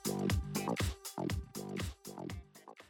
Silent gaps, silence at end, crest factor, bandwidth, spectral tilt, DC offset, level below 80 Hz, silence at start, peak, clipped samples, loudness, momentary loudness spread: none; 0.05 s; 18 dB; 18 kHz; -5 dB/octave; under 0.1%; -48 dBFS; 0 s; -22 dBFS; under 0.1%; -39 LUFS; 11 LU